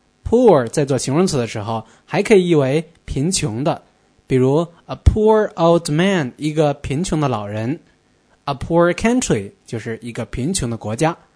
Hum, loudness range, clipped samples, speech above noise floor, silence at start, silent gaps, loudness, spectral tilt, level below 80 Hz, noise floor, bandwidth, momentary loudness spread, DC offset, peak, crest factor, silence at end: none; 4 LU; under 0.1%; 40 dB; 0.25 s; none; -18 LUFS; -5.5 dB/octave; -34 dBFS; -57 dBFS; 11 kHz; 13 LU; under 0.1%; 0 dBFS; 18 dB; 0.2 s